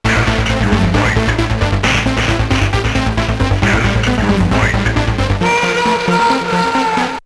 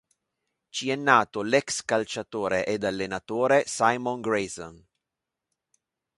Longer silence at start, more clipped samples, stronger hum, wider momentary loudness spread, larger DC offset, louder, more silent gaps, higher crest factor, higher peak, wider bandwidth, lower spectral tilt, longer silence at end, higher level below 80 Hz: second, 0.05 s vs 0.75 s; neither; neither; second, 3 LU vs 11 LU; neither; first, -14 LUFS vs -26 LUFS; neither; second, 14 dB vs 24 dB; first, 0 dBFS vs -4 dBFS; about the same, 11 kHz vs 11.5 kHz; first, -5.5 dB/octave vs -3.5 dB/octave; second, 0.05 s vs 1.4 s; first, -22 dBFS vs -62 dBFS